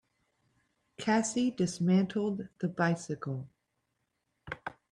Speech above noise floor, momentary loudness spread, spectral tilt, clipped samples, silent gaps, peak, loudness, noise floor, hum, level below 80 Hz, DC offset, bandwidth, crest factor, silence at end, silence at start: 50 dB; 14 LU; -5.5 dB/octave; under 0.1%; none; -16 dBFS; -31 LUFS; -81 dBFS; none; -70 dBFS; under 0.1%; 11 kHz; 18 dB; 0.2 s; 1 s